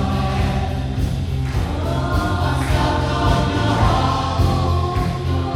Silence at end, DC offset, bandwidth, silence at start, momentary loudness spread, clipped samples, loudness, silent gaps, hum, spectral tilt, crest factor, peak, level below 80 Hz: 0 s; under 0.1%; 15 kHz; 0 s; 5 LU; under 0.1%; -19 LUFS; none; none; -6.5 dB/octave; 16 dB; -2 dBFS; -26 dBFS